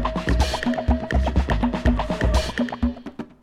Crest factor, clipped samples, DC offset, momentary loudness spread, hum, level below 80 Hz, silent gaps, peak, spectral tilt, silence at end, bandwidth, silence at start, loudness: 16 dB; under 0.1%; under 0.1%; 5 LU; none; -24 dBFS; none; -6 dBFS; -6 dB/octave; 0.15 s; 12.5 kHz; 0 s; -23 LUFS